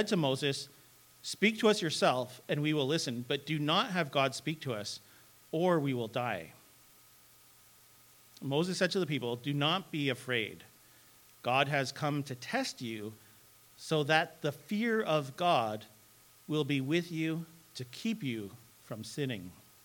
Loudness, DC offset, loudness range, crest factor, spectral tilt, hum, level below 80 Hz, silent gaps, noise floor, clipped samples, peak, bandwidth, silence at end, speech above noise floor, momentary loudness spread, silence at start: -33 LUFS; under 0.1%; 6 LU; 24 dB; -5 dB/octave; none; -78 dBFS; none; -61 dBFS; under 0.1%; -10 dBFS; 19 kHz; 0.3 s; 28 dB; 14 LU; 0 s